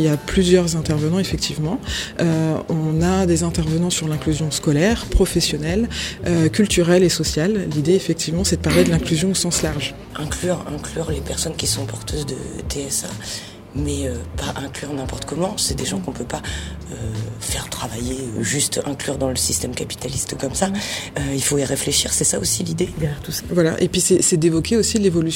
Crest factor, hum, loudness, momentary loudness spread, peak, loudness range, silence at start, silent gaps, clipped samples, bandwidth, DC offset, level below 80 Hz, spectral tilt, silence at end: 18 dB; none; -20 LUFS; 11 LU; -2 dBFS; 7 LU; 0 s; none; under 0.1%; 17 kHz; under 0.1%; -34 dBFS; -4.5 dB/octave; 0 s